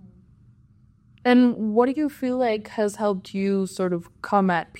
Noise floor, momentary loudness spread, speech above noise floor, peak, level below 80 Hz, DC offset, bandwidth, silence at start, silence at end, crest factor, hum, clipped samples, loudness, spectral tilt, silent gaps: -56 dBFS; 9 LU; 34 dB; -4 dBFS; -62 dBFS; under 0.1%; 14.5 kHz; 0.05 s; 0 s; 18 dB; none; under 0.1%; -23 LUFS; -6.5 dB/octave; none